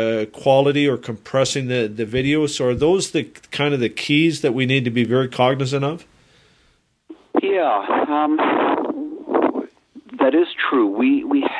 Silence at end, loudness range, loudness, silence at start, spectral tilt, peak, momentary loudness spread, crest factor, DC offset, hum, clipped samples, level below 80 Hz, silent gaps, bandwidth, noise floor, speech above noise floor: 0 s; 3 LU; -19 LUFS; 0 s; -5.5 dB/octave; -2 dBFS; 7 LU; 16 dB; under 0.1%; none; under 0.1%; -52 dBFS; none; 11 kHz; -60 dBFS; 42 dB